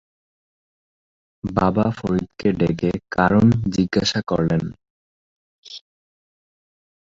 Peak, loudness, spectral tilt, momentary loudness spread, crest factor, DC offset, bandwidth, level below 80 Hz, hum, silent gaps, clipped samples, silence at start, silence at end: -2 dBFS; -20 LUFS; -6.5 dB/octave; 18 LU; 20 dB; under 0.1%; 7.8 kHz; -44 dBFS; none; 4.90-5.63 s; under 0.1%; 1.45 s; 1.25 s